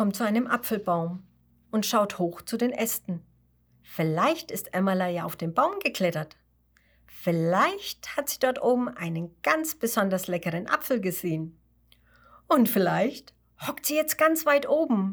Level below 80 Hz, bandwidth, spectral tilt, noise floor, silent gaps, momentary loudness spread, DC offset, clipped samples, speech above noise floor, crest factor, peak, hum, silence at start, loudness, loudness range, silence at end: -66 dBFS; over 20 kHz; -5 dB/octave; -65 dBFS; none; 10 LU; under 0.1%; under 0.1%; 39 dB; 20 dB; -8 dBFS; none; 0 s; -26 LUFS; 2 LU; 0 s